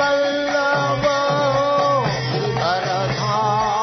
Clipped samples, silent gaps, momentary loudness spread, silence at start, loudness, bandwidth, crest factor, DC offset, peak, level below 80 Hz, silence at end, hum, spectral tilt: under 0.1%; none; 3 LU; 0 s; -19 LUFS; 6.4 kHz; 12 dB; under 0.1%; -6 dBFS; -48 dBFS; 0 s; none; -5 dB/octave